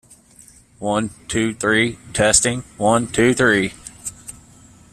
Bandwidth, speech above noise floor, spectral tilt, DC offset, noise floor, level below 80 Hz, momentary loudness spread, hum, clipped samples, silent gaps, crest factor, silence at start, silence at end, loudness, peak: 14 kHz; 30 dB; -3.5 dB/octave; under 0.1%; -48 dBFS; -44 dBFS; 17 LU; none; under 0.1%; none; 20 dB; 0.8 s; 0.6 s; -18 LUFS; 0 dBFS